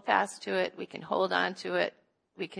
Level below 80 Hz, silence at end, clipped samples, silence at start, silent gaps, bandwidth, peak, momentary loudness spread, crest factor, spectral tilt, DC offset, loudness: -78 dBFS; 0 s; under 0.1%; 0.05 s; none; 10.5 kHz; -10 dBFS; 7 LU; 22 dB; -4 dB/octave; under 0.1%; -31 LUFS